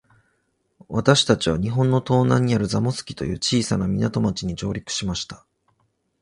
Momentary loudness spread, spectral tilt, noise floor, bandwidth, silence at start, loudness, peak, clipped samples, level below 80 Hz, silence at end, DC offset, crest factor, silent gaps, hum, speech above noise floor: 11 LU; -5.5 dB/octave; -70 dBFS; 11 kHz; 0.9 s; -22 LUFS; -2 dBFS; under 0.1%; -44 dBFS; 0.85 s; under 0.1%; 20 dB; none; none; 49 dB